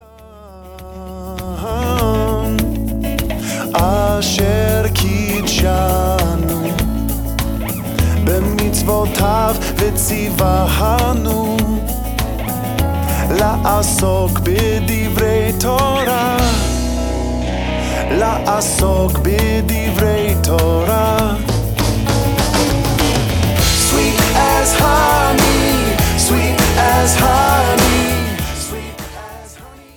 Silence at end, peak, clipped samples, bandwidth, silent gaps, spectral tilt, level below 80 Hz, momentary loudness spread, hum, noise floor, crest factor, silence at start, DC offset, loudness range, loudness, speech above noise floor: 0.15 s; 0 dBFS; under 0.1%; 19.5 kHz; none; -4.5 dB/octave; -22 dBFS; 8 LU; none; -39 dBFS; 14 dB; 0.2 s; under 0.1%; 4 LU; -15 LUFS; 25 dB